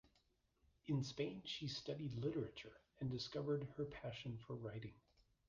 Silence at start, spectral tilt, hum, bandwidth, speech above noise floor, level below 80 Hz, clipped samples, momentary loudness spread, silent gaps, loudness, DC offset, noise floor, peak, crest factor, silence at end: 0.85 s; -6.5 dB/octave; none; 7.6 kHz; 34 dB; -72 dBFS; under 0.1%; 10 LU; none; -47 LUFS; under 0.1%; -80 dBFS; -30 dBFS; 18 dB; 0.5 s